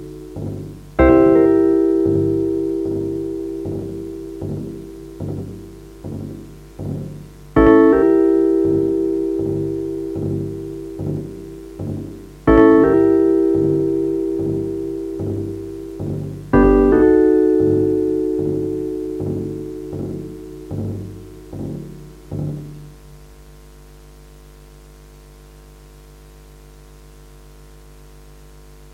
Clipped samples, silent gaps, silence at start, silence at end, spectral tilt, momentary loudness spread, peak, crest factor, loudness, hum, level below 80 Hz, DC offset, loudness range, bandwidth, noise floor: under 0.1%; none; 0 s; 0.05 s; -9 dB/octave; 21 LU; 0 dBFS; 18 dB; -17 LUFS; 50 Hz at -40 dBFS; -36 dBFS; under 0.1%; 15 LU; 10 kHz; -42 dBFS